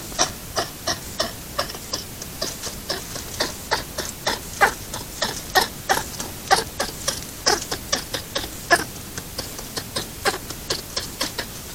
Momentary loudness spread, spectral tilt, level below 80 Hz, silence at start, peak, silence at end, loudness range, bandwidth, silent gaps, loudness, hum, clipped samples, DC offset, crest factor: 10 LU; -1.5 dB/octave; -44 dBFS; 0 s; 0 dBFS; 0 s; 4 LU; 17.5 kHz; none; -25 LUFS; none; under 0.1%; under 0.1%; 26 dB